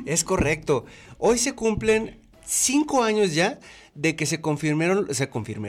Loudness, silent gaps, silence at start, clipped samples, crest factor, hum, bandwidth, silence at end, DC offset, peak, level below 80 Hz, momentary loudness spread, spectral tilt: -23 LUFS; none; 0 s; under 0.1%; 14 dB; none; 16.5 kHz; 0 s; under 0.1%; -10 dBFS; -46 dBFS; 6 LU; -4 dB/octave